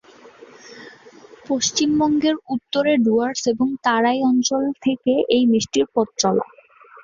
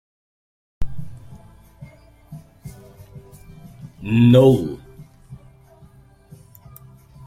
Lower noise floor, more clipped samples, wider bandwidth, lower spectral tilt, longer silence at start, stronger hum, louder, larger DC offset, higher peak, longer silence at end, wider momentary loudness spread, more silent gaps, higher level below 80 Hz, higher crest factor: about the same, -47 dBFS vs -49 dBFS; neither; second, 7.6 kHz vs 15 kHz; second, -3.5 dB/octave vs -8.5 dB/octave; second, 0.65 s vs 0.8 s; neither; second, -19 LUFS vs -15 LUFS; neither; about the same, -2 dBFS vs -2 dBFS; second, 0.6 s vs 1.9 s; second, 7 LU vs 31 LU; neither; second, -60 dBFS vs -42 dBFS; about the same, 18 dB vs 20 dB